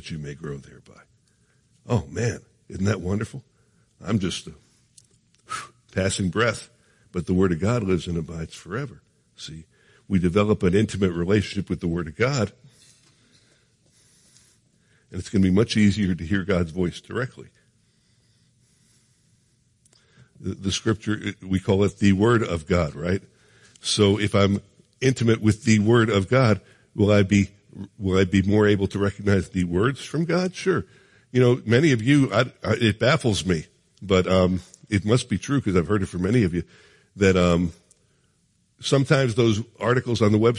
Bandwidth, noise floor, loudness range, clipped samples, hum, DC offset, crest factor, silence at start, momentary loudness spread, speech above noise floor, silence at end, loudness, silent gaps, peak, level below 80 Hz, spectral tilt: 11.5 kHz; -66 dBFS; 9 LU; under 0.1%; none; under 0.1%; 18 dB; 0.05 s; 15 LU; 44 dB; 0 s; -22 LUFS; none; -4 dBFS; -52 dBFS; -6 dB/octave